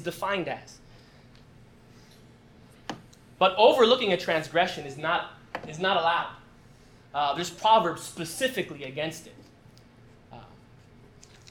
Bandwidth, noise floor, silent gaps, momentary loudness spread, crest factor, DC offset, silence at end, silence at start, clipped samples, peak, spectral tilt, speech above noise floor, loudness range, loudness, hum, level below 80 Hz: 18 kHz; -54 dBFS; none; 19 LU; 22 dB; under 0.1%; 1.05 s; 0 s; under 0.1%; -6 dBFS; -3.5 dB/octave; 28 dB; 11 LU; -26 LUFS; none; -62 dBFS